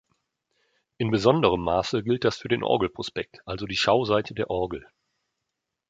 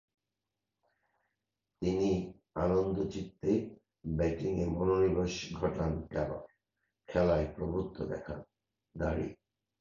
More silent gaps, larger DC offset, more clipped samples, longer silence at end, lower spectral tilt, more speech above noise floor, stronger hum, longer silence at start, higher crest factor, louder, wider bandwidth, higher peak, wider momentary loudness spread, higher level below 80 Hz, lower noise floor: neither; neither; neither; first, 1.1 s vs 0.45 s; second, -5.5 dB/octave vs -7.5 dB/octave; about the same, 59 dB vs 56 dB; neither; second, 1 s vs 1.8 s; about the same, 22 dB vs 20 dB; first, -25 LUFS vs -34 LUFS; first, 9.2 kHz vs 7.4 kHz; first, -4 dBFS vs -16 dBFS; about the same, 11 LU vs 13 LU; about the same, -52 dBFS vs -48 dBFS; second, -83 dBFS vs -89 dBFS